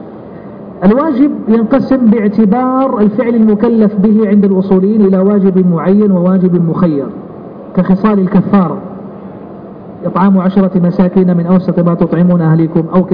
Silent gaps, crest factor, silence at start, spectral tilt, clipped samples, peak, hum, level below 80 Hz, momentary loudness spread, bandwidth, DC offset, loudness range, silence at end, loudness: none; 10 dB; 0 s; -12.5 dB/octave; under 0.1%; 0 dBFS; none; -42 dBFS; 19 LU; 5 kHz; under 0.1%; 4 LU; 0 s; -10 LUFS